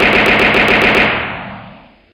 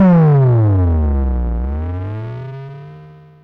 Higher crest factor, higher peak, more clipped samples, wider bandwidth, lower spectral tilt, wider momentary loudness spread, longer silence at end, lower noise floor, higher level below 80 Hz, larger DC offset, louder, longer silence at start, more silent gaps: about the same, 12 dB vs 8 dB; first, 0 dBFS vs -6 dBFS; neither; first, 17 kHz vs 4.2 kHz; second, -4.5 dB/octave vs -12 dB/octave; second, 16 LU vs 21 LU; about the same, 0.4 s vs 0.35 s; about the same, -39 dBFS vs -39 dBFS; second, -34 dBFS vs -22 dBFS; neither; first, -10 LUFS vs -15 LUFS; about the same, 0 s vs 0 s; neither